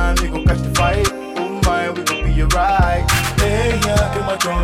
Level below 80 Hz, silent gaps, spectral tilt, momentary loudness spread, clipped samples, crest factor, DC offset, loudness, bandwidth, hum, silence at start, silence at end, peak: -22 dBFS; none; -4.5 dB/octave; 4 LU; under 0.1%; 12 dB; under 0.1%; -17 LUFS; 16.5 kHz; none; 0 s; 0 s; -4 dBFS